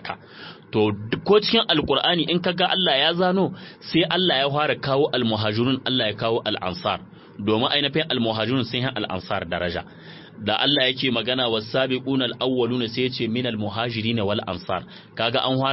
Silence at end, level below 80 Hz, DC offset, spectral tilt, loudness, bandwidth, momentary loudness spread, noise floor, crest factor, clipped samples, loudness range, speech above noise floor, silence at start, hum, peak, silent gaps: 0 s; -56 dBFS; under 0.1%; -8.5 dB/octave; -22 LUFS; 6 kHz; 10 LU; -42 dBFS; 18 dB; under 0.1%; 4 LU; 20 dB; 0 s; none; -6 dBFS; none